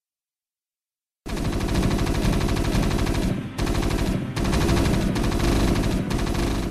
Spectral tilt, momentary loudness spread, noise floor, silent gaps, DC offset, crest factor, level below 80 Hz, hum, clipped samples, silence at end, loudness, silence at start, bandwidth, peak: -5.5 dB/octave; 5 LU; under -90 dBFS; none; under 0.1%; 14 dB; -28 dBFS; none; under 0.1%; 0 s; -24 LUFS; 1.25 s; 15 kHz; -8 dBFS